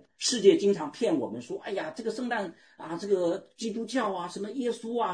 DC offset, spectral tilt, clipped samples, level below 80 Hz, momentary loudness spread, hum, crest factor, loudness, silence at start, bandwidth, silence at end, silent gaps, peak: under 0.1%; -4 dB/octave; under 0.1%; -78 dBFS; 14 LU; none; 22 dB; -29 LUFS; 0.2 s; 10.5 kHz; 0 s; none; -8 dBFS